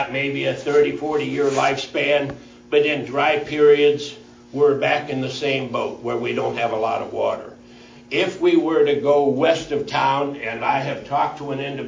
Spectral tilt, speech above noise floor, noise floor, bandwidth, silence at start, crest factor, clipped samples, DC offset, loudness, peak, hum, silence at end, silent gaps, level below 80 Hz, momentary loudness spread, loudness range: -5.5 dB/octave; 24 dB; -44 dBFS; 7.6 kHz; 0 s; 16 dB; under 0.1%; under 0.1%; -20 LUFS; -4 dBFS; none; 0 s; none; -58 dBFS; 9 LU; 4 LU